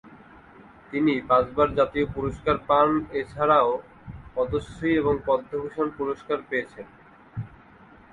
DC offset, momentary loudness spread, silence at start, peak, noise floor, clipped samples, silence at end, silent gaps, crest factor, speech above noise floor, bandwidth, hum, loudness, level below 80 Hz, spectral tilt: under 0.1%; 18 LU; 0.05 s; -6 dBFS; -51 dBFS; under 0.1%; 0.55 s; none; 18 dB; 27 dB; 10 kHz; none; -24 LUFS; -48 dBFS; -7.5 dB/octave